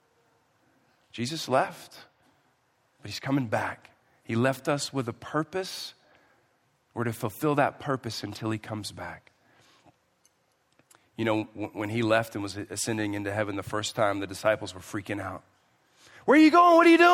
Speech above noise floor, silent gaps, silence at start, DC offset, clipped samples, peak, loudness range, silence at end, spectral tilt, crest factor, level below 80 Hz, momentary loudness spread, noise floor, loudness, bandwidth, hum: 44 dB; none; 1.15 s; under 0.1%; under 0.1%; -8 dBFS; 6 LU; 0 s; -5 dB/octave; 20 dB; -70 dBFS; 19 LU; -70 dBFS; -27 LUFS; 16 kHz; none